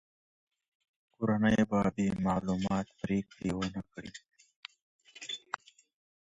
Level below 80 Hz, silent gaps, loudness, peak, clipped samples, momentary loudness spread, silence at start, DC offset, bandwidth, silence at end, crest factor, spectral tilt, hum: -58 dBFS; 4.56-4.63 s, 4.82-4.99 s; -33 LUFS; -14 dBFS; under 0.1%; 22 LU; 1.2 s; under 0.1%; 8 kHz; 1 s; 20 dB; -6.5 dB/octave; none